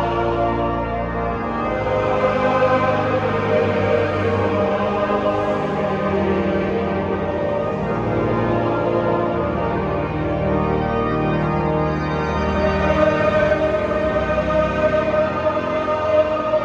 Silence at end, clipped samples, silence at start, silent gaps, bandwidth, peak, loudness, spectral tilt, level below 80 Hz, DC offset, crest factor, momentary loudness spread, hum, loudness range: 0 s; under 0.1%; 0 s; none; 7.8 kHz; -4 dBFS; -19 LUFS; -8 dB/octave; -36 dBFS; under 0.1%; 14 dB; 5 LU; none; 2 LU